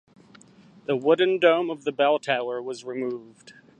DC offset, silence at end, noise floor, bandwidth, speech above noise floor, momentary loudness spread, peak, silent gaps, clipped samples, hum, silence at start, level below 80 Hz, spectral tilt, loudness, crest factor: under 0.1%; 0.3 s; -53 dBFS; 9.2 kHz; 29 dB; 13 LU; -4 dBFS; none; under 0.1%; none; 0.9 s; -78 dBFS; -5 dB/octave; -24 LUFS; 20 dB